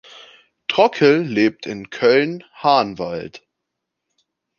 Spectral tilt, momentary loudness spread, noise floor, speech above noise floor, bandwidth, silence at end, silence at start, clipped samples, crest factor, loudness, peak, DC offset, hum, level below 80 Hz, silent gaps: -6 dB/octave; 15 LU; -79 dBFS; 62 dB; 7 kHz; 1.2 s; 0.15 s; under 0.1%; 18 dB; -18 LUFS; -2 dBFS; under 0.1%; none; -62 dBFS; none